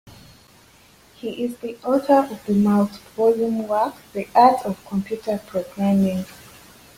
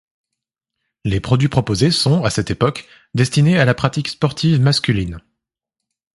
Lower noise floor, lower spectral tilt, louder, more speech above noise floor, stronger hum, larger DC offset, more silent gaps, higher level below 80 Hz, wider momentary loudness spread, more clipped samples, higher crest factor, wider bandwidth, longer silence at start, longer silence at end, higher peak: second, -52 dBFS vs -82 dBFS; first, -7.5 dB/octave vs -5.5 dB/octave; second, -21 LUFS vs -17 LUFS; second, 32 dB vs 66 dB; neither; neither; neither; second, -58 dBFS vs -40 dBFS; about the same, 13 LU vs 11 LU; neither; about the same, 18 dB vs 18 dB; first, 16 kHz vs 11.5 kHz; second, 0.05 s vs 1.05 s; second, 0.65 s vs 0.95 s; about the same, -2 dBFS vs 0 dBFS